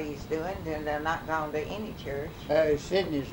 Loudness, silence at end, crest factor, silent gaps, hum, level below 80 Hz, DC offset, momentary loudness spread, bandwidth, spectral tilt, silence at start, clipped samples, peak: -30 LUFS; 0 s; 18 dB; none; none; -48 dBFS; under 0.1%; 10 LU; over 20 kHz; -5.5 dB/octave; 0 s; under 0.1%; -12 dBFS